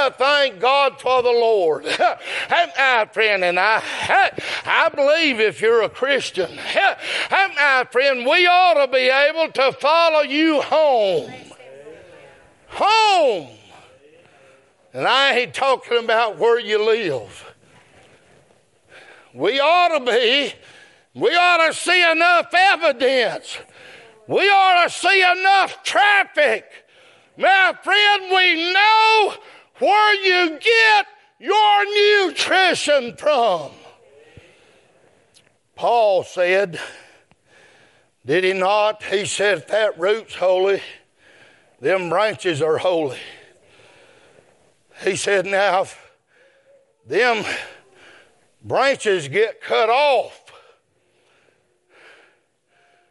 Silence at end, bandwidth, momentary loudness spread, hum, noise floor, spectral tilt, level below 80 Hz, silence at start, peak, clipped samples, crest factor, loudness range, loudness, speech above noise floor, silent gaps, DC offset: 2.8 s; 11.5 kHz; 10 LU; none; -63 dBFS; -2.5 dB/octave; -70 dBFS; 0 s; -2 dBFS; under 0.1%; 18 dB; 8 LU; -17 LUFS; 45 dB; none; under 0.1%